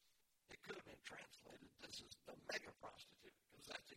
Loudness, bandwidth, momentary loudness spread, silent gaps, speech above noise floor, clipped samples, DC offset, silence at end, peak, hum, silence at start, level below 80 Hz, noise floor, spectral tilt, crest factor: -56 LUFS; 16 kHz; 14 LU; none; 24 dB; under 0.1%; under 0.1%; 0 s; -34 dBFS; none; 0 s; -84 dBFS; -79 dBFS; -2 dB/octave; 24 dB